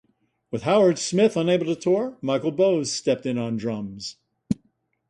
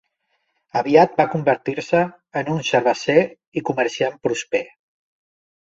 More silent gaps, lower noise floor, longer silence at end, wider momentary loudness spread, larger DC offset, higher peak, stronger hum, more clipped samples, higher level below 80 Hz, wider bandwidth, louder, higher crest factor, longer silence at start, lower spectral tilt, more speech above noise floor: second, none vs 3.47-3.52 s; about the same, -68 dBFS vs -71 dBFS; second, 0.55 s vs 1 s; about the same, 12 LU vs 10 LU; neither; second, -6 dBFS vs -2 dBFS; neither; neither; about the same, -60 dBFS vs -62 dBFS; first, 11.5 kHz vs 7.8 kHz; second, -23 LUFS vs -20 LUFS; about the same, 16 dB vs 20 dB; second, 0.5 s vs 0.75 s; about the same, -5.5 dB/octave vs -5.5 dB/octave; second, 46 dB vs 52 dB